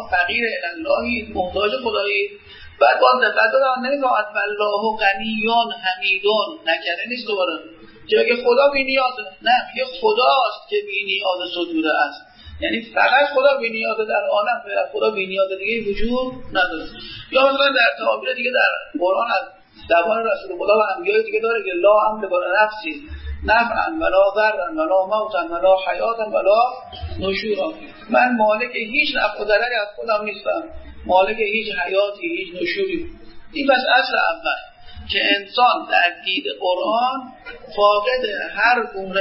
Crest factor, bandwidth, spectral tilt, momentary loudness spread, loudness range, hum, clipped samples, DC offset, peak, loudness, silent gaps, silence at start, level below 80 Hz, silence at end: 18 dB; 5.8 kHz; -8 dB/octave; 9 LU; 2 LU; none; under 0.1%; under 0.1%; -2 dBFS; -19 LUFS; none; 0 s; -44 dBFS; 0 s